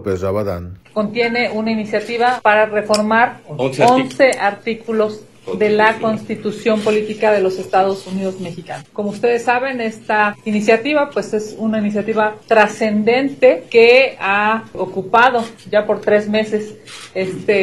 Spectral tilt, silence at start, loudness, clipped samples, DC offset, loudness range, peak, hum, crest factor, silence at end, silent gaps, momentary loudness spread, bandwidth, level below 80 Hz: -5 dB/octave; 0 s; -16 LUFS; under 0.1%; 0.3%; 4 LU; 0 dBFS; none; 16 dB; 0 s; none; 11 LU; 12.5 kHz; -56 dBFS